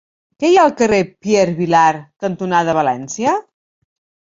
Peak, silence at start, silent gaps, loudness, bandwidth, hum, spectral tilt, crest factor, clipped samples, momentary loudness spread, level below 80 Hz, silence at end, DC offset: -2 dBFS; 0.4 s; none; -15 LUFS; 7.8 kHz; none; -5 dB/octave; 16 dB; under 0.1%; 10 LU; -54 dBFS; 0.9 s; under 0.1%